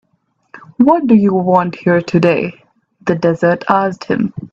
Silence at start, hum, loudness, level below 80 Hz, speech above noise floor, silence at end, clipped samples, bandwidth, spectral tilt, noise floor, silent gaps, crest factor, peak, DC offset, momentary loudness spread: 0.55 s; none; -14 LUFS; -54 dBFS; 50 dB; 0.05 s; under 0.1%; 7.6 kHz; -8 dB/octave; -63 dBFS; none; 14 dB; 0 dBFS; under 0.1%; 7 LU